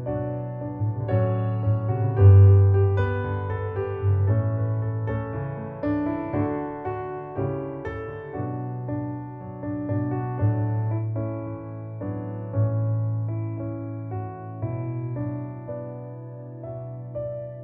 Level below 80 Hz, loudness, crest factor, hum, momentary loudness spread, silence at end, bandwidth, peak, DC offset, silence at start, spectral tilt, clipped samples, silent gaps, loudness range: -50 dBFS; -25 LUFS; 20 dB; none; 13 LU; 0 s; 3.5 kHz; -6 dBFS; under 0.1%; 0 s; -12 dB/octave; under 0.1%; none; 11 LU